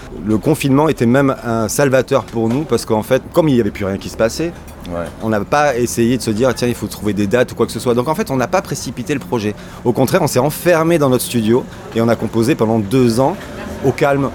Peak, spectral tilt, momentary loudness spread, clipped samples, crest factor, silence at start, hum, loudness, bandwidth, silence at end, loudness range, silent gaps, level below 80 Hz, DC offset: 0 dBFS; -6 dB/octave; 9 LU; under 0.1%; 14 dB; 0 s; none; -16 LUFS; 19 kHz; 0 s; 3 LU; none; -40 dBFS; under 0.1%